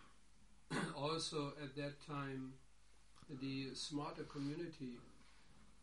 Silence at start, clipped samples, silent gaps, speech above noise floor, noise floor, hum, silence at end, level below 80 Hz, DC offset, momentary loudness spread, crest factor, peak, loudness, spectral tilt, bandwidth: 0 s; under 0.1%; none; 24 dB; -70 dBFS; none; 0.05 s; -72 dBFS; under 0.1%; 14 LU; 18 dB; -30 dBFS; -46 LUFS; -4.5 dB/octave; 11.5 kHz